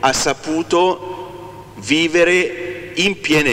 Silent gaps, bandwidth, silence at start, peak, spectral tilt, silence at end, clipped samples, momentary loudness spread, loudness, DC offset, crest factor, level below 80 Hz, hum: none; 16 kHz; 0 s; 0 dBFS; -3.5 dB/octave; 0 s; under 0.1%; 18 LU; -16 LUFS; under 0.1%; 18 dB; -46 dBFS; none